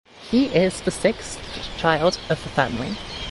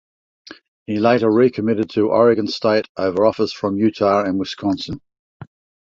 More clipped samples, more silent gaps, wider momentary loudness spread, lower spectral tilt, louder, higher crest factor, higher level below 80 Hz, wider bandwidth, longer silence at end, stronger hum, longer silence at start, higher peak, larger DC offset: neither; second, none vs 0.68-0.86 s, 2.89-2.95 s, 5.19-5.40 s; first, 12 LU vs 9 LU; second, -5 dB/octave vs -7 dB/octave; second, -23 LUFS vs -18 LUFS; about the same, 18 dB vs 16 dB; first, -44 dBFS vs -54 dBFS; first, 11.5 kHz vs 7.6 kHz; second, 0 s vs 0.5 s; neither; second, 0.15 s vs 0.5 s; about the same, -4 dBFS vs -2 dBFS; neither